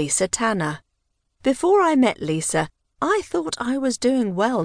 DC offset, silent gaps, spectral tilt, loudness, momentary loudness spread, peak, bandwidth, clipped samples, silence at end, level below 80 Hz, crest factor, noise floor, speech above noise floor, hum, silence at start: under 0.1%; none; -4 dB/octave; -21 LUFS; 9 LU; -8 dBFS; 10.5 kHz; under 0.1%; 0 s; -54 dBFS; 14 dB; -73 dBFS; 52 dB; none; 0 s